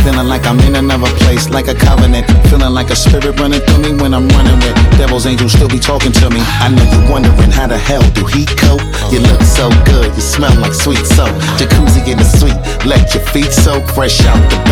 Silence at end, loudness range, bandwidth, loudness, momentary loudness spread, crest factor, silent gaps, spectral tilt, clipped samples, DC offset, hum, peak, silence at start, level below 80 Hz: 0 s; 1 LU; 17 kHz; -9 LUFS; 4 LU; 8 dB; none; -5 dB/octave; under 0.1%; under 0.1%; none; 0 dBFS; 0 s; -12 dBFS